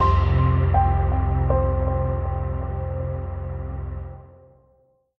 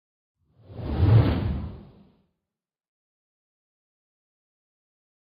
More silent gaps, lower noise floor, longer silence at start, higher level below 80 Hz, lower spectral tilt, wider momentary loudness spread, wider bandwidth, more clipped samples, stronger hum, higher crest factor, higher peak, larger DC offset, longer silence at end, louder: neither; second, -62 dBFS vs -88 dBFS; second, 0 s vs 0.7 s; first, -28 dBFS vs -40 dBFS; about the same, -10 dB/octave vs -11 dB/octave; second, 13 LU vs 20 LU; about the same, 5 kHz vs 5.2 kHz; neither; neither; about the same, 16 dB vs 20 dB; about the same, -6 dBFS vs -8 dBFS; neither; second, 0.9 s vs 3.45 s; about the same, -23 LUFS vs -23 LUFS